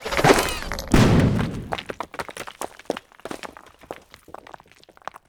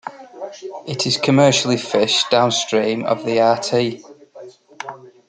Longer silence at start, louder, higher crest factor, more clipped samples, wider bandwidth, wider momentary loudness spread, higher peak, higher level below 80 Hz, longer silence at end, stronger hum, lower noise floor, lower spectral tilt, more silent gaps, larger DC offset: about the same, 0 s vs 0.05 s; second, -22 LUFS vs -17 LUFS; about the same, 22 dB vs 18 dB; neither; first, over 20 kHz vs 9.6 kHz; first, 24 LU vs 20 LU; about the same, 0 dBFS vs -2 dBFS; first, -36 dBFS vs -62 dBFS; first, 0.95 s vs 0.2 s; neither; first, -52 dBFS vs -41 dBFS; first, -5.5 dB/octave vs -4 dB/octave; neither; neither